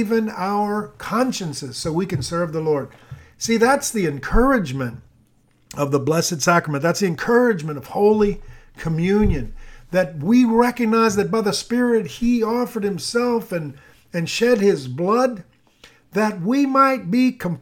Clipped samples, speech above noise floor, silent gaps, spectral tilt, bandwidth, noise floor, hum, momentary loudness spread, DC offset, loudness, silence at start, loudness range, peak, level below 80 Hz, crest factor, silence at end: under 0.1%; 39 dB; none; -5.5 dB/octave; 17.5 kHz; -58 dBFS; none; 11 LU; under 0.1%; -20 LUFS; 0 s; 3 LU; -2 dBFS; -36 dBFS; 18 dB; 0 s